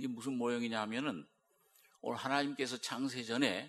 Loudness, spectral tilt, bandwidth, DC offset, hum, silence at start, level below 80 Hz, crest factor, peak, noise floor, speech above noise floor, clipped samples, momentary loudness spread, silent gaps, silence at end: -37 LUFS; -4 dB/octave; 13.5 kHz; under 0.1%; none; 0 s; -86 dBFS; 22 dB; -16 dBFS; -71 dBFS; 34 dB; under 0.1%; 7 LU; none; 0 s